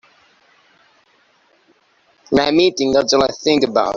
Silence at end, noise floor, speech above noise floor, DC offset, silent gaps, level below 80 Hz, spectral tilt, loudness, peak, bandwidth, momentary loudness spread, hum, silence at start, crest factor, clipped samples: 0 s; -58 dBFS; 43 dB; under 0.1%; none; -52 dBFS; -4 dB/octave; -15 LUFS; -2 dBFS; 7.6 kHz; 3 LU; none; 2.3 s; 18 dB; under 0.1%